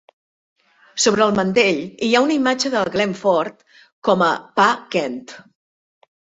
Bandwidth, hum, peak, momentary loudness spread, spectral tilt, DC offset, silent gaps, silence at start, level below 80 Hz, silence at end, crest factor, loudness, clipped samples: 8.2 kHz; none; -2 dBFS; 8 LU; -3.5 dB/octave; under 0.1%; 3.92-4.02 s; 0.95 s; -60 dBFS; 1 s; 18 dB; -18 LUFS; under 0.1%